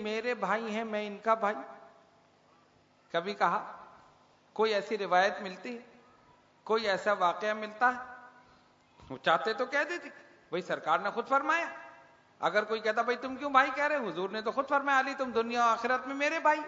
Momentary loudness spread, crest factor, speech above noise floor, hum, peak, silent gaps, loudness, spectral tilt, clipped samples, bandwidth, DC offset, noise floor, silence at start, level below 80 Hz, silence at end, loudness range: 14 LU; 22 dB; 34 dB; none; -10 dBFS; none; -31 LUFS; -1.5 dB/octave; under 0.1%; 7.4 kHz; under 0.1%; -65 dBFS; 0 s; -76 dBFS; 0 s; 5 LU